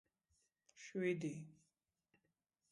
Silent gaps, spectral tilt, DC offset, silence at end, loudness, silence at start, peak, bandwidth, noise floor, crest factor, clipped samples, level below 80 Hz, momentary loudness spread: none; -6.5 dB/octave; under 0.1%; 1.2 s; -44 LUFS; 0.75 s; -28 dBFS; 11.5 kHz; -88 dBFS; 22 dB; under 0.1%; -90 dBFS; 18 LU